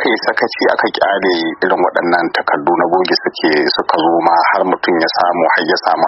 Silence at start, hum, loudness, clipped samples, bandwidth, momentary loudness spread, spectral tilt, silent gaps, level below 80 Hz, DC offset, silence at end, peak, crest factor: 0 s; none; -13 LUFS; under 0.1%; 6 kHz; 3 LU; -5.5 dB/octave; none; -58 dBFS; under 0.1%; 0 s; 0 dBFS; 14 dB